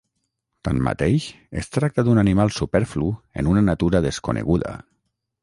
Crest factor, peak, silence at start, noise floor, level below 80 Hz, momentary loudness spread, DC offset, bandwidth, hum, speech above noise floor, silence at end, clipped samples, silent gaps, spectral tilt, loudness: 16 dB; -4 dBFS; 0.65 s; -76 dBFS; -38 dBFS; 12 LU; under 0.1%; 11.5 kHz; none; 55 dB; 0.6 s; under 0.1%; none; -7 dB/octave; -21 LUFS